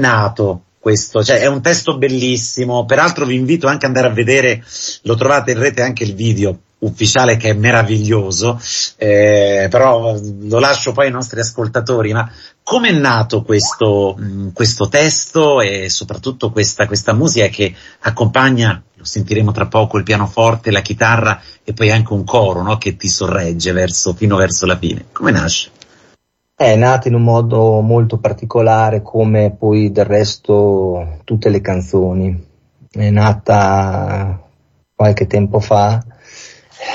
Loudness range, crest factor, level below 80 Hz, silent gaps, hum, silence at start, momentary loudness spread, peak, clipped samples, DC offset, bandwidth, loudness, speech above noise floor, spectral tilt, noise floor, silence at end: 2 LU; 12 dB; -36 dBFS; none; none; 0 s; 8 LU; 0 dBFS; under 0.1%; under 0.1%; 8.2 kHz; -13 LUFS; 43 dB; -5 dB/octave; -56 dBFS; 0 s